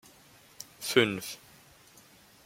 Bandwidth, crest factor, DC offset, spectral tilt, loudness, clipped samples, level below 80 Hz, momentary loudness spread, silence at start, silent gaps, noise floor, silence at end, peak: 16.5 kHz; 28 dB; under 0.1%; -3.5 dB/octave; -29 LUFS; under 0.1%; -72 dBFS; 22 LU; 0.6 s; none; -58 dBFS; 1.1 s; -6 dBFS